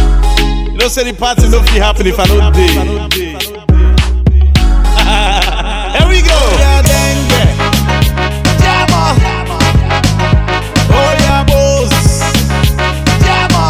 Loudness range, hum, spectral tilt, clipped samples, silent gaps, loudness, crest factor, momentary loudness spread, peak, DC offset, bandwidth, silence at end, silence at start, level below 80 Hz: 1 LU; none; -4.5 dB/octave; 2%; none; -10 LUFS; 8 dB; 5 LU; 0 dBFS; 0.3%; 16 kHz; 0 s; 0 s; -12 dBFS